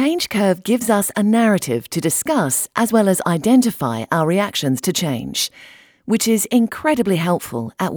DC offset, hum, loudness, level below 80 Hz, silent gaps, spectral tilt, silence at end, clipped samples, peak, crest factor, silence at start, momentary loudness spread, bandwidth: under 0.1%; none; -18 LUFS; -56 dBFS; none; -4.5 dB/octave; 0 s; under 0.1%; -2 dBFS; 16 dB; 0 s; 7 LU; over 20 kHz